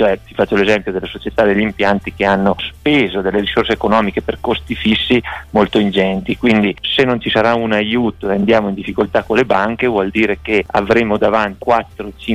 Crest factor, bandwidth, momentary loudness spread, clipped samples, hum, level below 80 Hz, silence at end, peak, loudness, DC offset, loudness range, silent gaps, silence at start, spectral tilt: 12 dB; 11.5 kHz; 5 LU; under 0.1%; none; -38 dBFS; 0 s; -2 dBFS; -15 LUFS; under 0.1%; 1 LU; none; 0 s; -6.5 dB/octave